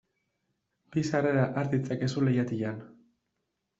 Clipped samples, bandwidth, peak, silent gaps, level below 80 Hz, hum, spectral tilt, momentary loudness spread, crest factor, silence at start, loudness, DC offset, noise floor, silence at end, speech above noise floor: under 0.1%; 8 kHz; -12 dBFS; none; -68 dBFS; none; -7.5 dB/octave; 8 LU; 18 dB; 0.9 s; -29 LUFS; under 0.1%; -82 dBFS; 0.95 s; 53 dB